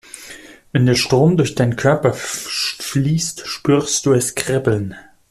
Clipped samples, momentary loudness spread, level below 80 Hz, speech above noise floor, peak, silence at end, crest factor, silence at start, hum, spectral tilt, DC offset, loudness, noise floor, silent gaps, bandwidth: under 0.1%; 11 LU; -48 dBFS; 23 dB; -2 dBFS; 0.3 s; 16 dB; 0.15 s; none; -5 dB/octave; under 0.1%; -17 LUFS; -39 dBFS; none; 15 kHz